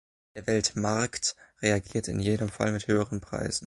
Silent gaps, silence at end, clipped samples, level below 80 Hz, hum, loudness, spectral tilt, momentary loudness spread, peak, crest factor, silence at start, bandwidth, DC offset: none; 0 s; under 0.1%; -52 dBFS; none; -29 LUFS; -4.5 dB/octave; 6 LU; -10 dBFS; 18 dB; 0.35 s; 11.5 kHz; under 0.1%